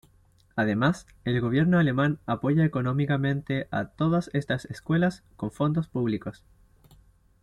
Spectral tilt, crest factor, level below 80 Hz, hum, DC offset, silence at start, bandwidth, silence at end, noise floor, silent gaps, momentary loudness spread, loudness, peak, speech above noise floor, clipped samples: -8 dB/octave; 16 dB; -56 dBFS; none; under 0.1%; 0.55 s; 11.5 kHz; 1.1 s; -61 dBFS; none; 10 LU; -26 LUFS; -10 dBFS; 35 dB; under 0.1%